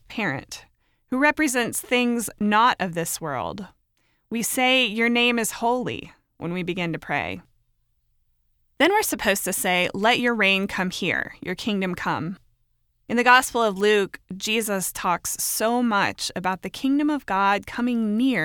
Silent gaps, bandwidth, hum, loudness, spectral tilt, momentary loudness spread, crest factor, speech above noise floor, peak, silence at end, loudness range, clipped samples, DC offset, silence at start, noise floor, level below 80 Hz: none; 19.5 kHz; none; -22 LUFS; -3 dB/octave; 12 LU; 20 dB; 45 dB; -2 dBFS; 0 s; 4 LU; under 0.1%; under 0.1%; 0.1 s; -68 dBFS; -56 dBFS